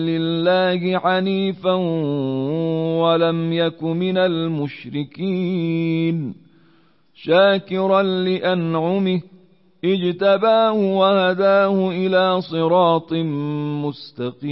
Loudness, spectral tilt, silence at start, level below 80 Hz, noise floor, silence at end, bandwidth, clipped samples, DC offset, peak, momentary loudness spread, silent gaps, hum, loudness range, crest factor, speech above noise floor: -19 LUFS; -11.5 dB/octave; 0 s; -66 dBFS; -57 dBFS; 0 s; 5.8 kHz; under 0.1%; 0.1%; -4 dBFS; 10 LU; none; none; 4 LU; 14 dB; 38 dB